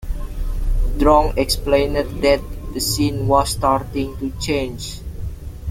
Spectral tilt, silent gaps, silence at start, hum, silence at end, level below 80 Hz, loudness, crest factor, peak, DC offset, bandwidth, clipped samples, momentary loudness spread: -5 dB/octave; none; 0 s; none; 0 s; -24 dBFS; -19 LUFS; 18 dB; -2 dBFS; under 0.1%; 16.5 kHz; under 0.1%; 15 LU